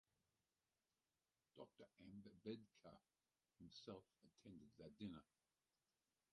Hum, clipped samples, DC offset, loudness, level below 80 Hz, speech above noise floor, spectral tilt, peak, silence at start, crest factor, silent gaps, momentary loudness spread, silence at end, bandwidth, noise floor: none; under 0.1%; under 0.1%; -62 LUFS; -86 dBFS; over 29 dB; -6.5 dB/octave; -40 dBFS; 1.55 s; 24 dB; none; 11 LU; 1.1 s; 9.4 kHz; under -90 dBFS